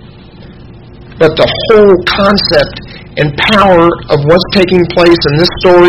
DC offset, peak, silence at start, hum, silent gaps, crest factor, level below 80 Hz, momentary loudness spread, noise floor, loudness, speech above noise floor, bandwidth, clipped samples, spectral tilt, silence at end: 0.9%; 0 dBFS; 0.05 s; none; none; 8 dB; -30 dBFS; 7 LU; -32 dBFS; -8 LUFS; 25 dB; 10.5 kHz; 3%; -6.5 dB/octave; 0 s